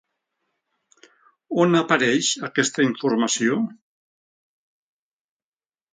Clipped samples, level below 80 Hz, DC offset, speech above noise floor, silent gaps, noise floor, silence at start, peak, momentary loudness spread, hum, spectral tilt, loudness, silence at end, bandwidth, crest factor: under 0.1%; -70 dBFS; under 0.1%; over 69 dB; none; under -90 dBFS; 1.5 s; -4 dBFS; 7 LU; none; -3.5 dB/octave; -21 LUFS; 2.2 s; 9.6 kHz; 22 dB